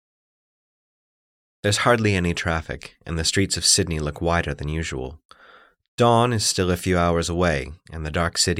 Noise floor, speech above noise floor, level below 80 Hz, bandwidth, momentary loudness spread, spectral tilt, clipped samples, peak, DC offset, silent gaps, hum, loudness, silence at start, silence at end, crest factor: -52 dBFS; 30 dB; -40 dBFS; 16.5 kHz; 15 LU; -4 dB/octave; under 0.1%; -4 dBFS; under 0.1%; 5.25-5.29 s, 5.88-5.98 s; none; -21 LUFS; 1.65 s; 0 s; 20 dB